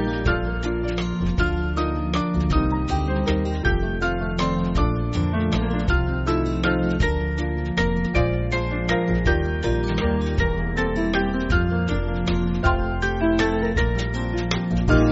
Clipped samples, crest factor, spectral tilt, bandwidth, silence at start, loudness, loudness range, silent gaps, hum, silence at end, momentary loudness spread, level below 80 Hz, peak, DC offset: under 0.1%; 16 dB; -5.5 dB/octave; 8 kHz; 0 s; -23 LUFS; 1 LU; none; none; 0 s; 3 LU; -26 dBFS; -6 dBFS; 0.1%